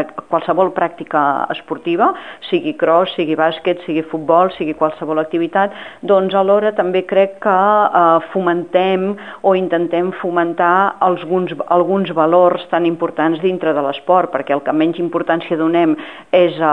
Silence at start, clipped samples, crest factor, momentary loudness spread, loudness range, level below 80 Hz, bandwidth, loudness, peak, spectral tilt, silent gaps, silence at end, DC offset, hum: 0 s; under 0.1%; 14 dB; 7 LU; 3 LU; -62 dBFS; 4.3 kHz; -16 LUFS; 0 dBFS; -8 dB/octave; none; 0 s; 0.3%; none